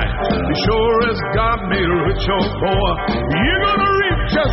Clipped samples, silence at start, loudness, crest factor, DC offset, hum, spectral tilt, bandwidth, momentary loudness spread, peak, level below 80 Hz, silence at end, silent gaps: under 0.1%; 0 s; -17 LUFS; 10 dB; under 0.1%; none; -4 dB/octave; 6 kHz; 3 LU; -6 dBFS; -26 dBFS; 0 s; none